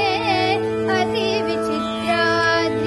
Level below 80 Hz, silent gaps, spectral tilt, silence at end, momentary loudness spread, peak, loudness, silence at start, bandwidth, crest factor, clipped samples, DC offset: -52 dBFS; none; -5 dB/octave; 0 s; 5 LU; -6 dBFS; -19 LUFS; 0 s; 12 kHz; 14 dB; under 0.1%; under 0.1%